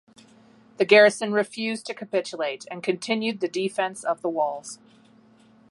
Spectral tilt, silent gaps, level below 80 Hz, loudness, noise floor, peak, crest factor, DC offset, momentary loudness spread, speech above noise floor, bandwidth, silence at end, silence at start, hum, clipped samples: -3.5 dB/octave; none; -80 dBFS; -24 LUFS; -55 dBFS; -2 dBFS; 22 dB; under 0.1%; 14 LU; 32 dB; 11.5 kHz; 0.95 s; 0.8 s; none; under 0.1%